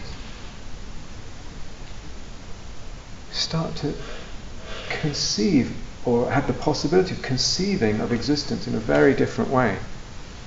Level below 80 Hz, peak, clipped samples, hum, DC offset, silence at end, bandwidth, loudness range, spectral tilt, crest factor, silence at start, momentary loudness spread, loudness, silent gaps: -38 dBFS; -4 dBFS; under 0.1%; none; under 0.1%; 0 s; 8 kHz; 11 LU; -5 dB/octave; 20 dB; 0 s; 20 LU; -23 LUFS; none